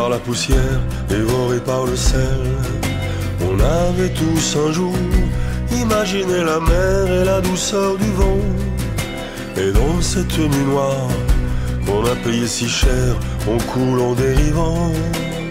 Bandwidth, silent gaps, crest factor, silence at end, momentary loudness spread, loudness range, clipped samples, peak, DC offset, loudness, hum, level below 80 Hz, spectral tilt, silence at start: 16 kHz; none; 12 dB; 0 s; 5 LU; 2 LU; under 0.1%; -4 dBFS; under 0.1%; -18 LUFS; none; -22 dBFS; -5.5 dB/octave; 0 s